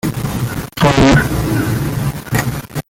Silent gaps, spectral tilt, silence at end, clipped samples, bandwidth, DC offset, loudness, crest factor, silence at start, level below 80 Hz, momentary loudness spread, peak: none; -5.5 dB/octave; 0.1 s; under 0.1%; 17 kHz; under 0.1%; -15 LUFS; 14 dB; 0.05 s; -28 dBFS; 11 LU; 0 dBFS